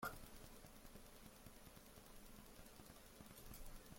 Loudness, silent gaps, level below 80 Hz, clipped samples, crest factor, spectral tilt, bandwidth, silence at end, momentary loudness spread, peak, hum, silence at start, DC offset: -60 LUFS; none; -64 dBFS; under 0.1%; 22 dB; -3.5 dB/octave; 16.5 kHz; 0 s; 3 LU; -36 dBFS; none; 0 s; under 0.1%